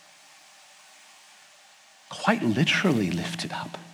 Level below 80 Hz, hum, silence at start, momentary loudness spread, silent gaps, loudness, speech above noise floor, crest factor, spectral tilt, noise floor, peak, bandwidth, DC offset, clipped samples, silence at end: -66 dBFS; none; 2.1 s; 12 LU; none; -25 LUFS; 29 dB; 24 dB; -5 dB/octave; -55 dBFS; -6 dBFS; 16 kHz; under 0.1%; under 0.1%; 0 s